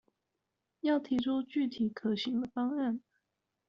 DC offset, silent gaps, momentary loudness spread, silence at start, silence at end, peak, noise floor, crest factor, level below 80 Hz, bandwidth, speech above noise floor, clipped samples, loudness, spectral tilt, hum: under 0.1%; none; 4 LU; 0.85 s; 0.7 s; -20 dBFS; -85 dBFS; 14 dB; -72 dBFS; 7.2 kHz; 53 dB; under 0.1%; -34 LUFS; -4.5 dB/octave; none